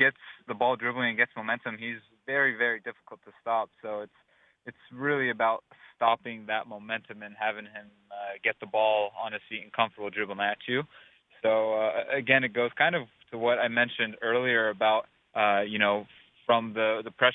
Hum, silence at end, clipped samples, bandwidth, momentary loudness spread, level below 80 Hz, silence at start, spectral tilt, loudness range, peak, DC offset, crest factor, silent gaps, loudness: none; 0 s; under 0.1%; 4 kHz; 15 LU; -78 dBFS; 0 s; -7.5 dB/octave; 5 LU; -6 dBFS; under 0.1%; 22 dB; none; -28 LUFS